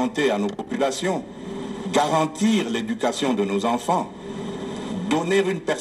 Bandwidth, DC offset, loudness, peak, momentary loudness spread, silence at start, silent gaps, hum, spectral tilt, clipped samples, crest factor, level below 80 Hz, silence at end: 15 kHz; under 0.1%; -24 LUFS; -8 dBFS; 11 LU; 0 s; none; none; -5 dB/octave; under 0.1%; 16 dB; -58 dBFS; 0 s